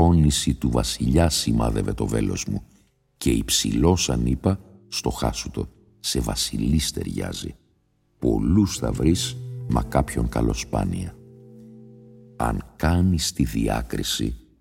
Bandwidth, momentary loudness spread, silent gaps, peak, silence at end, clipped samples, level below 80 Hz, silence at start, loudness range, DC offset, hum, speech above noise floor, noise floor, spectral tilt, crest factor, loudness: 16.5 kHz; 11 LU; none; -4 dBFS; 0.2 s; under 0.1%; -32 dBFS; 0 s; 4 LU; under 0.1%; none; 43 dB; -65 dBFS; -5 dB/octave; 20 dB; -23 LUFS